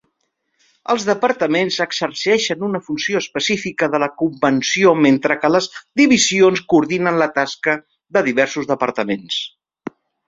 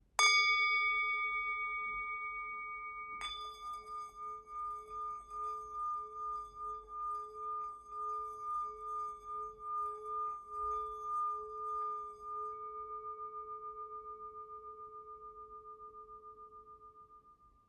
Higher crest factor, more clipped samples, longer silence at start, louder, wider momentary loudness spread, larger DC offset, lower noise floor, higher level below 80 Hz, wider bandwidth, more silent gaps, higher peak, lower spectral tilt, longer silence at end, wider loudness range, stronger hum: second, 16 dB vs 24 dB; neither; first, 0.9 s vs 0.2 s; first, -17 LUFS vs -38 LUFS; second, 10 LU vs 19 LU; neither; first, -71 dBFS vs -65 dBFS; first, -60 dBFS vs -68 dBFS; second, 7.8 kHz vs 13 kHz; neither; first, -2 dBFS vs -16 dBFS; first, -3.5 dB/octave vs 1 dB/octave; first, 0.8 s vs 0.2 s; second, 4 LU vs 12 LU; neither